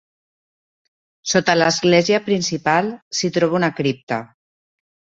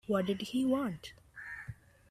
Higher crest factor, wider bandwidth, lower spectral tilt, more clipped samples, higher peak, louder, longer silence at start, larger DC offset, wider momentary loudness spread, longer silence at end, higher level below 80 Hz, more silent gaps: about the same, 18 dB vs 18 dB; second, 8 kHz vs 14 kHz; second, -4 dB/octave vs -6 dB/octave; neither; first, -2 dBFS vs -18 dBFS; first, -18 LUFS vs -35 LUFS; first, 1.25 s vs 0.1 s; neither; second, 10 LU vs 18 LU; first, 0.9 s vs 0.35 s; about the same, -60 dBFS vs -64 dBFS; first, 3.02-3.11 s, 4.03-4.07 s vs none